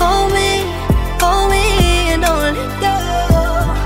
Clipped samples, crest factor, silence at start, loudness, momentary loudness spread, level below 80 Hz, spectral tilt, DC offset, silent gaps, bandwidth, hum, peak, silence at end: under 0.1%; 14 dB; 0 s; -15 LUFS; 4 LU; -18 dBFS; -4.5 dB/octave; under 0.1%; none; 16.5 kHz; none; 0 dBFS; 0 s